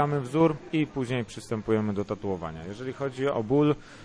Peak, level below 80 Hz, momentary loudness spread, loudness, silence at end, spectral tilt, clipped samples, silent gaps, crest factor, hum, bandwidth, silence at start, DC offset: -10 dBFS; -54 dBFS; 10 LU; -28 LUFS; 0 s; -7.5 dB/octave; under 0.1%; none; 18 dB; none; 11 kHz; 0 s; under 0.1%